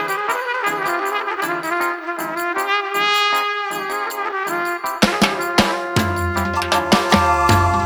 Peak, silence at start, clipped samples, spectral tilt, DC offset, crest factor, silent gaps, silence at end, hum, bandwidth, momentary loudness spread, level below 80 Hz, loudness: 0 dBFS; 0 s; under 0.1%; -4 dB/octave; under 0.1%; 18 dB; none; 0 s; none; over 20 kHz; 8 LU; -40 dBFS; -18 LUFS